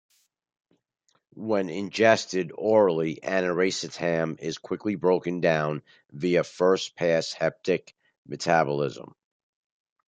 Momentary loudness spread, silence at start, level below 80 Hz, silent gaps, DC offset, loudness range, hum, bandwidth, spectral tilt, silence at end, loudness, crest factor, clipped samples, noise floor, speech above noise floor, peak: 11 LU; 1.35 s; -68 dBFS; 8.18-8.25 s; under 0.1%; 2 LU; none; 9.4 kHz; -5 dB/octave; 1.05 s; -25 LUFS; 20 dB; under 0.1%; -72 dBFS; 47 dB; -6 dBFS